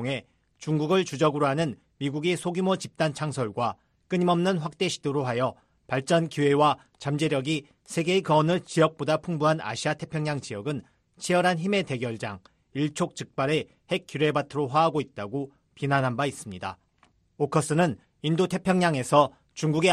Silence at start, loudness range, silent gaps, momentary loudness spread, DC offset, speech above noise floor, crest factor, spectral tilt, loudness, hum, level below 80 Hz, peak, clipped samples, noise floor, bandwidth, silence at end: 0 s; 3 LU; none; 11 LU; under 0.1%; 39 dB; 22 dB; -5.5 dB/octave; -26 LUFS; none; -64 dBFS; -6 dBFS; under 0.1%; -65 dBFS; 13 kHz; 0 s